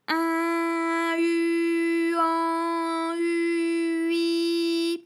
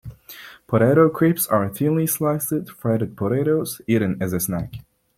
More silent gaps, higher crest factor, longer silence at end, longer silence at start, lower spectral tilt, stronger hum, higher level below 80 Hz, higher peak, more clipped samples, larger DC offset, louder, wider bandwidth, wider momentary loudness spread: neither; second, 12 dB vs 18 dB; second, 0.05 s vs 0.35 s; about the same, 0.1 s vs 0.05 s; second, -2 dB/octave vs -6.5 dB/octave; neither; second, under -90 dBFS vs -52 dBFS; second, -12 dBFS vs -4 dBFS; neither; neither; second, -25 LUFS vs -21 LUFS; second, 13.5 kHz vs 16.5 kHz; second, 3 LU vs 19 LU